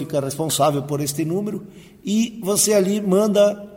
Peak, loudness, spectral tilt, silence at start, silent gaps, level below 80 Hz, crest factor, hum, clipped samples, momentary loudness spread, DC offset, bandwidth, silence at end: -4 dBFS; -20 LUFS; -4.5 dB/octave; 0 s; none; -58 dBFS; 16 dB; none; under 0.1%; 9 LU; under 0.1%; 16.5 kHz; 0 s